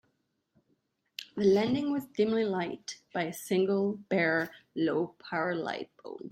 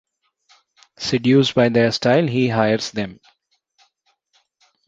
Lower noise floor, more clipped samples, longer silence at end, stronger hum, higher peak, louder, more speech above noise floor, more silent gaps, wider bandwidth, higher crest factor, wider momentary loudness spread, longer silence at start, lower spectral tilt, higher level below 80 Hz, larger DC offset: first, -77 dBFS vs -66 dBFS; neither; second, 0 s vs 1.75 s; neither; second, -14 dBFS vs -2 dBFS; second, -30 LUFS vs -18 LUFS; about the same, 47 dB vs 49 dB; neither; first, 16 kHz vs 8 kHz; about the same, 18 dB vs 18 dB; about the same, 14 LU vs 12 LU; first, 1.2 s vs 1 s; about the same, -5.5 dB/octave vs -6 dB/octave; second, -72 dBFS vs -56 dBFS; neither